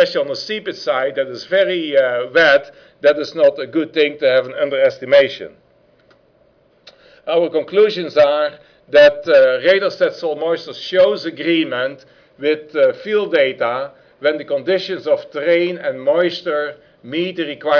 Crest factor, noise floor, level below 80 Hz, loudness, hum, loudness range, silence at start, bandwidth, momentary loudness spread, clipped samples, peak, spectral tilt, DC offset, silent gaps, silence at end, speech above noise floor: 12 dB; -55 dBFS; -62 dBFS; -16 LUFS; none; 5 LU; 0 s; 5.4 kHz; 10 LU; under 0.1%; -4 dBFS; -5 dB/octave; under 0.1%; none; 0 s; 39 dB